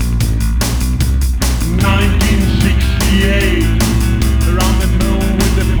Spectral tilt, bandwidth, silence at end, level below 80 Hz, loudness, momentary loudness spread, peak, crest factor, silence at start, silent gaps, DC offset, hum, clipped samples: -5 dB/octave; over 20 kHz; 0 s; -14 dBFS; -14 LUFS; 3 LU; 0 dBFS; 12 dB; 0 s; none; under 0.1%; none; under 0.1%